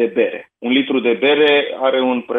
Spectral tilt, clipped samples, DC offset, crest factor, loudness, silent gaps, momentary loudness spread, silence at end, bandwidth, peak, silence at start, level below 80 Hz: -6.5 dB/octave; under 0.1%; under 0.1%; 14 dB; -16 LUFS; none; 7 LU; 0 s; 4.2 kHz; -2 dBFS; 0 s; -72 dBFS